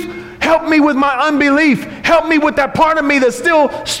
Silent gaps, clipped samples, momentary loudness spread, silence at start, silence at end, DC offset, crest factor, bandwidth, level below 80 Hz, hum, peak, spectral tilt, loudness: none; under 0.1%; 4 LU; 0 s; 0 s; under 0.1%; 10 dB; 15.5 kHz; -42 dBFS; none; -2 dBFS; -4 dB/octave; -12 LUFS